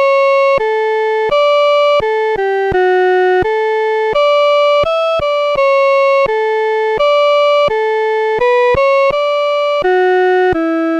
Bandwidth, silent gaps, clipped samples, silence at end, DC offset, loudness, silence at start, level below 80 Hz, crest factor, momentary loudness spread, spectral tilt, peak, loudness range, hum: 8.6 kHz; none; under 0.1%; 0 s; under 0.1%; -12 LUFS; 0 s; -42 dBFS; 8 dB; 4 LU; -5 dB/octave; -4 dBFS; 0 LU; none